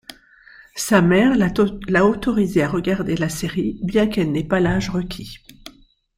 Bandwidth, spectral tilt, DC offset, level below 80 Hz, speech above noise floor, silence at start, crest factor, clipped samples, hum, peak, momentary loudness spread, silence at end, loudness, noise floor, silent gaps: 16.5 kHz; -6 dB/octave; under 0.1%; -40 dBFS; 32 dB; 0.1 s; 18 dB; under 0.1%; none; -2 dBFS; 13 LU; 0.45 s; -19 LUFS; -50 dBFS; none